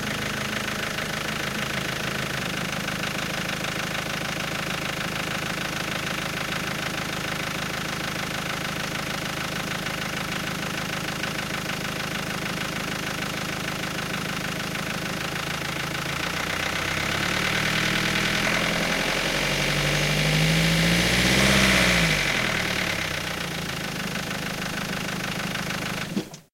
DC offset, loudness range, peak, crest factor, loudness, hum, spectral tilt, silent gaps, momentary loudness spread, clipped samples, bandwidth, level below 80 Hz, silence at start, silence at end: under 0.1%; 8 LU; -8 dBFS; 20 dB; -25 LUFS; none; -3.5 dB/octave; none; 8 LU; under 0.1%; 17 kHz; -44 dBFS; 0 s; 0.1 s